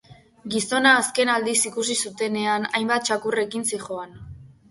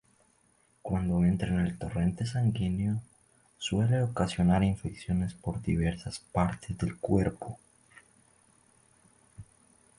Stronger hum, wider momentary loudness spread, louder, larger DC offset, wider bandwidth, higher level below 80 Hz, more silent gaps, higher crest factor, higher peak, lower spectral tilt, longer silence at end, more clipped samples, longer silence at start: neither; first, 14 LU vs 10 LU; first, -22 LUFS vs -30 LUFS; neither; about the same, 12 kHz vs 11.5 kHz; second, -58 dBFS vs -46 dBFS; neither; about the same, 20 dB vs 20 dB; first, -4 dBFS vs -12 dBFS; second, -2 dB/octave vs -7 dB/octave; second, 0.2 s vs 0.55 s; neither; second, 0.1 s vs 0.85 s